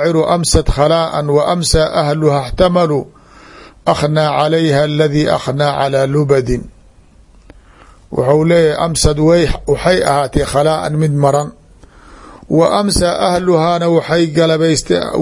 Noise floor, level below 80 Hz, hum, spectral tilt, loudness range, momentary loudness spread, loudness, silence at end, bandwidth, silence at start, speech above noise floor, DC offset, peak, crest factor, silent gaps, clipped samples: -44 dBFS; -28 dBFS; none; -5.5 dB/octave; 3 LU; 4 LU; -13 LUFS; 0 s; 11.5 kHz; 0 s; 32 dB; under 0.1%; 0 dBFS; 14 dB; none; under 0.1%